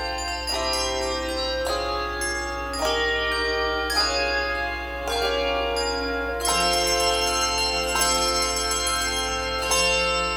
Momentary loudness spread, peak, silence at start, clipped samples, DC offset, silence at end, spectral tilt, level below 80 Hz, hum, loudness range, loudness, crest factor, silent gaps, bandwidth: 6 LU; -8 dBFS; 0 s; under 0.1%; under 0.1%; 0 s; -1.5 dB/octave; -38 dBFS; none; 3 LU; -23 LUFS; 16 dB; none; over 20 kHz